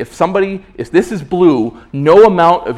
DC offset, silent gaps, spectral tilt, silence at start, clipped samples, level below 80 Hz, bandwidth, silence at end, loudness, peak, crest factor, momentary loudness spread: under 0.1%; none; -7 dB/octave; 0 s; 1%; -44 dBFS; 12 kHz; 0 s; -11 LUFS; 0 dBFS; 12 dB; 12 LU